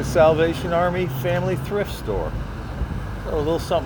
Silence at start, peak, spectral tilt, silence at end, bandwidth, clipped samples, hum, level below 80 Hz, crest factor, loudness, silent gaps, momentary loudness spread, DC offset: 0 s; -4 dBFS; -6.5 dB/octave; 0 s; over 20 kHz; under 0.1%; none; -32 dBFS; 16 dB; -23 LUFS; none; 13 LU; under 0.1%